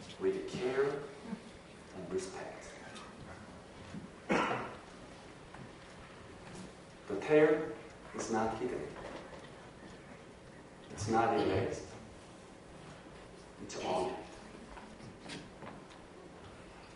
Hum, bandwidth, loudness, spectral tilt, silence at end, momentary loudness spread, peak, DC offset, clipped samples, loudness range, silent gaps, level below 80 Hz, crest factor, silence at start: none; 11 kHz; -36 LUFS; -5 dB/octave; 0 s; 20 LU; -16 dBFS; under 0.1%; under 0.1%; 8 LU; none; -64 dBFS; 22 dB; 0 s